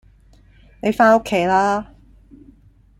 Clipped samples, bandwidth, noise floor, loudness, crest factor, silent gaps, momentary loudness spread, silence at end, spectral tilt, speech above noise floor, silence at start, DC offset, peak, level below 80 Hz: under 0.1%; 14 kHz; -50 dBFS; -17 LUFS; 18 dB; none; 11 LU; 1.15 s; -5.5 dB/octave; 34 dB; 0.85 s; under 0.1%; -2 dBFS; -50 dBFS